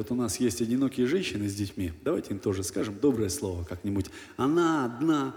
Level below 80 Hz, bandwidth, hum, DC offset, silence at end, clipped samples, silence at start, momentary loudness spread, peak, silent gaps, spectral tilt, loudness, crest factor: -54 dBFS; 18 kHz; none; under 0.1%; 0 s; under 0.1%; 0 s; 7 LU; -14 dBFS; none; -5.5 dB/octave; -29 LUFS; 16 dB